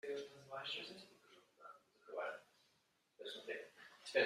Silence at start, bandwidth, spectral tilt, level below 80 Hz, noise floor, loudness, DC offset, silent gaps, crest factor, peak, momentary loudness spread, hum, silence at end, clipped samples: 0.05 s; 14 kHz; -2.5 dB/octave; under -90 dBFS; -80 dBFS; -49 LUFS; under 0.1%; none; 24 dB; -22 dBFS; 17 LU; none; 0 s; under 0.1%